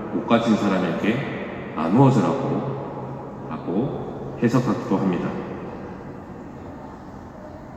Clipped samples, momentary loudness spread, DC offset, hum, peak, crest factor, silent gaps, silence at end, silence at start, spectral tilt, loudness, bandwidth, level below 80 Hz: under 0.1%; 19 LU; under 0.1%; none; -4 dBFS; 20 dB; none; 0 s; 0 s; -7.5 dB/octave; -23 LUFS; 8.6 kHz; -52 dBFS